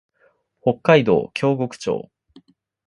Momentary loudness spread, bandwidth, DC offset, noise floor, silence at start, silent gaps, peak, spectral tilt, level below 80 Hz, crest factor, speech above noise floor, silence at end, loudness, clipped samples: 11 LU; 11 kHz; under 0.1%; -62 dBFS; 0.65 s; none; 0 dBFS; -6.5 dB/octave; -58 dBFS; 20 dB; 43 dB; 0.85 s; -20 LUFS; under 0.1%